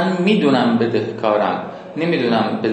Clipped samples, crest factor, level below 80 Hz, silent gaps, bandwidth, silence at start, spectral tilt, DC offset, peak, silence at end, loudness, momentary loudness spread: under 0.1%; 14 dB; -66 dBFS; none; 8.8 kHz; 0 s; -7 dB/octave; under 0.1%; -2 dBFS; 0 s; -17 LUFS; 8 LU